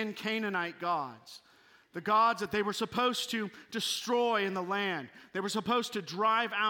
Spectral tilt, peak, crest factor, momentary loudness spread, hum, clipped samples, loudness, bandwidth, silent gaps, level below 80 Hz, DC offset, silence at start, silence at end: -3.5 dB/octave; -16 dBFS; 16 dB; 12 LU; none; under 0.1%; -32 LUFS; 17 kHz; none; -76 dBFS; under 0.1%; 0 s; 0 s